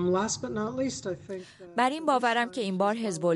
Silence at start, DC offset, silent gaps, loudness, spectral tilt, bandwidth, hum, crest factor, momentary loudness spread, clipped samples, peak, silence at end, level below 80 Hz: 0 s; under 0.1%; none; -29 LUFS; -4.5 dB/octave; 11.5 kHz; none; 16 dB; 11 LU; under 0.1%; -12 dBFS; 0 s; -64 dBFS